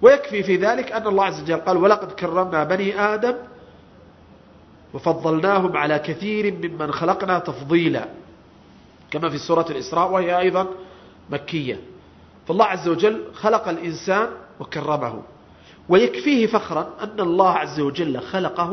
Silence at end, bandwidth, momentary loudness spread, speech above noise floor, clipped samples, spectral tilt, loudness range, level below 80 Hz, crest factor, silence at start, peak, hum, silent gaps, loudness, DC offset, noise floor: 0 s; 6.4 kHz; 11 LU; 28 dB; under 0.1%; -6 dB/octave; 3 LU; -58 dBFS; 20 dB; 0 s; 0 dBFS; none; none; -21 LUFS; under 0.1%; -48 dBFS